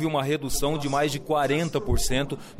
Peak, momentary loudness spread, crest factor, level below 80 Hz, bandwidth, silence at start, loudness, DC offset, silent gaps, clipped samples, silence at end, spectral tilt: -14 dBFS; 3 LU; 12 dB; -34 dBFS; 16 kHz; 0 s; -26 LUFS; under 0.1%; none; under 0.1%; 0 s; -4.5 dB/octave